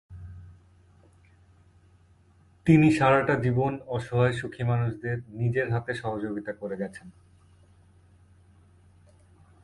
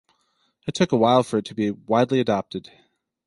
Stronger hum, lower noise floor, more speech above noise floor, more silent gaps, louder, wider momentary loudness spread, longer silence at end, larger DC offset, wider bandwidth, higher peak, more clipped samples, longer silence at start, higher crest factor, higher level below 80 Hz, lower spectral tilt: neither; second, -59 dBFS vs -69 dBFS; second, 34 dB vs 47 dB; neither; second, -26 LUFS vs -22 LUFS; about the same, 17 LU vs 16 LU; first, 2.55 s vs 0.65 s; neither; about the same, 11.5 kHz vs 11.5 kHz; about the same, -6 dBFS vs -4 dBFS; neither; second, 0.1 s vs 0.65 s; about the same, 22 dB vs 20 dB; first, -54 dBFS vs -60 dBFS; first, -8 dB/octave vs -6 dB/octave